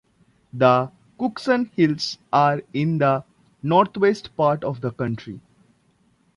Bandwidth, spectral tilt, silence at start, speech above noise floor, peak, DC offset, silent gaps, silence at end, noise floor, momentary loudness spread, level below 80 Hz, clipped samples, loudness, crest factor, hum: 11.5 kHz; -7 dB/octave; 0.55 s; 42 dB; -4 dBFS; under 0.1%; none; 0.95 s; -62 dBFS; 14 LU; -60 dBFS; under 0.1%; -21 LUFS; 18 dB; none